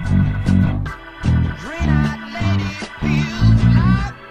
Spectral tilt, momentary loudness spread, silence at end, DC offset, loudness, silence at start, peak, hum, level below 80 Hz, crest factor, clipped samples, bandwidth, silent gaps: -7.5 dB/octave; 10 LU; 0 s; under 0.1%; -18 LUFS; 0 s; -4 dBFS; none; -26 dBFS; 14 dB; under 0.1%; 9.4 kHz; none